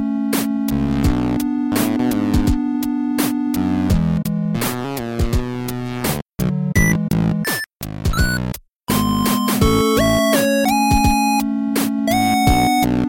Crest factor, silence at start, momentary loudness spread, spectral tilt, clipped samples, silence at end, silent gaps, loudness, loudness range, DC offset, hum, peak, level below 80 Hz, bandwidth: 16 dB; 0 s; 8 LU; -5 dB/octave; under 0.1%; 0 s; 6.22-6.26 s, 7.76-7.80 s, 8.76-8.80 s; -18 LUFS; 4 LU; under 0.1%; none; -2 dBFS; -28 dBFS; 17 kHz